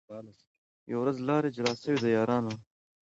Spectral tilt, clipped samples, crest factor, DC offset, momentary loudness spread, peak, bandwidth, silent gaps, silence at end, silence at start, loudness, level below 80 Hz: -6 dB/octave; under 0.1%; 16 dB; under 0.1%; 16 LU; -14 dBFS; 8 kHz; 0.47-0.86 s; 0.45 s; 0.1 s; -30 LUFS; -70 dBFS